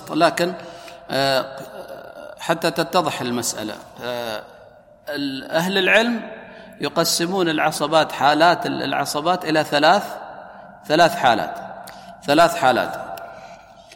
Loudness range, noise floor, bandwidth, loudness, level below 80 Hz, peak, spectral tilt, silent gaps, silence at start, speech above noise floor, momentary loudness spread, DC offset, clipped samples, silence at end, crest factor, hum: 6 LU; -47 dBFS; 17 kHz; -19 LUFS; -58 dBFS; -2 dBFS; -3.5 dB/octave; none; 0 s; 28 dB; 22 LU; under 0.1%; under 0.1%; 0 s; 20 dB; none